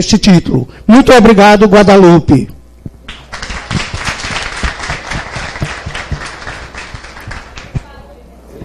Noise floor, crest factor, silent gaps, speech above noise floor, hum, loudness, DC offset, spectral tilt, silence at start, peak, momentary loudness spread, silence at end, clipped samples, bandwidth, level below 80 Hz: -35 dBFS; 10 dB; none; 30 dB; none; -8 LUFS; under 0.1%; -5.5 dB/octave; 0 s; 0 dBFS; 23 LU; 0 s; 1%; 13.5 kHz; -28 dBFS